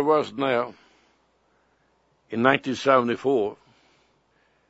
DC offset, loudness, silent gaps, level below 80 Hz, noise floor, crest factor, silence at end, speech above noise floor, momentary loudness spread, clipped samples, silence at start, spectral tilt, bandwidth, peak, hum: under 0.1%; -23 LUFS; none; -72 dBFS; -66 dBFS; 24 dB; 1.15 s; 44 dB; 10 LU; under 0.1%; 0 s; -5.5 dB/octave; 8 kHz; -2 dBFS; none